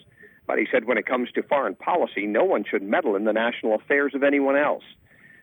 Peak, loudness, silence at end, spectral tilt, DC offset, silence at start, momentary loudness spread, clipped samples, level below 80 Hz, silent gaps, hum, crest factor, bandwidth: -8 dBFS; -23 LUFS; 0.6 s; -7.5 dB/octave; under 0.1%; 0.2 s; 5 LU; under 0.1%; -74 dBFS; none; none; 14 dB; 18 kHz